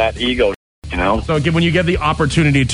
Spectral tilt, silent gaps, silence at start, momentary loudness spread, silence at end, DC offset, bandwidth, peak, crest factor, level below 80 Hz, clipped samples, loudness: -5.5 dB/octave; 0.56-0.82 s; 0 s; 5 LU; 0 s; under 0.1%; 11 kHz; -4 dBFS; 12 dB; -30 dBFS; under 0.1%; -16 LUFS